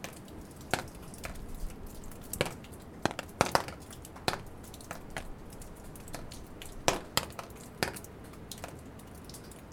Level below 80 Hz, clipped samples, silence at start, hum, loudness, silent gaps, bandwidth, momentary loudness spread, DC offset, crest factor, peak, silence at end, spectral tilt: -50 dBFS; under 0.1%; 0 s; none; -38 LUFS; none; over 20 kHz; 16 LU; under 0.1%; 36 dB; -2 dBFS; 0 s; -3.5 dB/octave